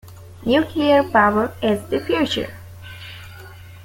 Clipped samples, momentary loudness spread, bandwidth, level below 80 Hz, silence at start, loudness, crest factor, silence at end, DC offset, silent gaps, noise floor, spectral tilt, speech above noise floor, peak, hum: under 0.1%; 23 LU; 17 kHz; -50 dBFS; 0.05 s; -19 LUFS; 18 dB; 0 s; under 0.1%; none; -39 dBFS; -5.5 dB/octave; 21 dB; -4 dBFS; none